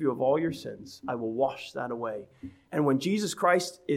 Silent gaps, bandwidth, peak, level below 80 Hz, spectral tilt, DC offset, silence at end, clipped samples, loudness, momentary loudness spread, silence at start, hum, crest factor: none; 16 kHz; -10 dBFS; -68 dBFS; -5 dB/octave; under 0.1%; 0 s; under 0.1%; -29 LUFS; 15 LU; 0 s; none; 18 dB